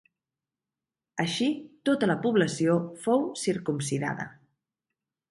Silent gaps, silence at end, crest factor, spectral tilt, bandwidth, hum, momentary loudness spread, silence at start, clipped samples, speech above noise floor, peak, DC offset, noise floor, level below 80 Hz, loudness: none; 1 s; 18 dB; -5 dB/octave; 11.5 kHz; none; 8 LU; 1.15 s; under 0.1%; over 63 dB; -10 dBFS; under 0.1%; under -90 dBFS; -70 dBFS; -28 LUFS